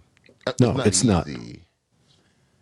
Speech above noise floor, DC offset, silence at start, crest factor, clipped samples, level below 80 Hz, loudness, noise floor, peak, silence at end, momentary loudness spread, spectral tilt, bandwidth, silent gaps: 42 dB; under 0.1%; 0.45 s; 20 dB; under 0.1%; -48 dBFS; -21 LUFS; -63 dBFS; -6 dBFS; 1.05 s; 17 LU; -5 dB/octave; 12 kHz; none